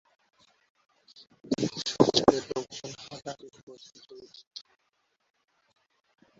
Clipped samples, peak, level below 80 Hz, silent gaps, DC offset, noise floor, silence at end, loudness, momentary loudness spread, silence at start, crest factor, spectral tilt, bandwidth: under 0.1%; -4 dBFS; -62 dBFS; 3.63-3.67 s, 4.47-4.51 s; under 0.1%; -75 dBFS; 1.8 s; -28 LUFS; 27 LU; 1.45 s; 30 dB; -4.5 dB/octave; 8 kHz